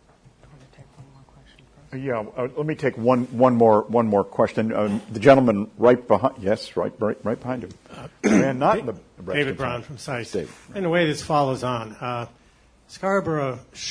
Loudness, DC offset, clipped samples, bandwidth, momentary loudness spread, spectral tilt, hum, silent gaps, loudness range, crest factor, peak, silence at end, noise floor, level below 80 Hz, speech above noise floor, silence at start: -22 LUFS; under 0.1%; under 0.1%; 10.5 kHz; 15 LU; -6.5 dB/octave; none; none; 7 LU; 20 dB; -2 dBFS; 0 s; -56 dBFS; -56 dBFS; 34 dB; 0.8 s